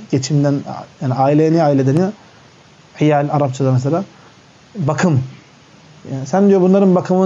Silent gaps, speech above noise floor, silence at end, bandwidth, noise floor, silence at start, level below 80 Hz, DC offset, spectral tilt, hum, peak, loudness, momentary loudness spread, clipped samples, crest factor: none; 31 dB; 0 s; 8 kHz; -45 dBFS; 0 s; -62 dBFS; under 0.1%; -7.5 dB/octave; none; -4 dBFS; -15 LUFS; 14 LU; under 0.1%; 12 dB